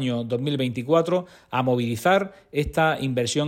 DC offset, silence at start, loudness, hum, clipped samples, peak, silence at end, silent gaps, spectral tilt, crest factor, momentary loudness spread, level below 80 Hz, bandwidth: under 0.1%; 0 s; -24 LUFS; none; under 0.1%; -6 dBFS; 0 s; none; -5.5 dB/octave; 16 dB; 6 LU; -48 dBFS; 16.5 kHz